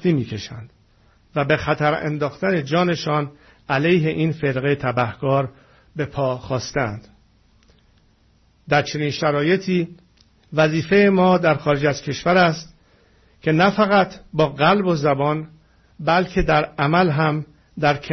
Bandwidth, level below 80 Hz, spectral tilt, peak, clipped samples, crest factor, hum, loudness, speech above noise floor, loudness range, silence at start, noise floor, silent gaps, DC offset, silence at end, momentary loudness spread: 6.4 kHz; -44 dBFS; -6.5 dB/octave; -4 dBFS; under 0.1%; 18 dB; none; -20 LUFS; 38 dB; 6 LU; 0 s; -57 dBFS; none; under 0.1%; 0 s; 12 LU